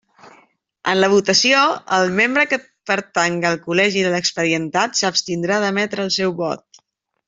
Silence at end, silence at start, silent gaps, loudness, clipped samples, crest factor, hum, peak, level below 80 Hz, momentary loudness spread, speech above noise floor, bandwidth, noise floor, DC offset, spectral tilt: 0.7 s; 0.25 s; none; -17 LUFS; under 0.1%; 16 dB; none; -2 dBFS; -62 dBFS; 8 LU; 47 dB; 8 kHz; -64 dBFS; under 0.1%; -3 dB/octave